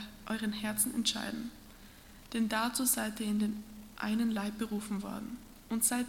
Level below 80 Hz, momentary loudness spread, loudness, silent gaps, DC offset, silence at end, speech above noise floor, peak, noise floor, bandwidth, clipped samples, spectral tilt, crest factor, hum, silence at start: -60 dBFS; 19 LU; -34 LUFS; none; under 0.1%; 0 s; 20 dB; -14 dBFS; -54 dBFS; 17.5 kHz; under 0.1%; -3 dB/octave; 20 dB; none; 0 s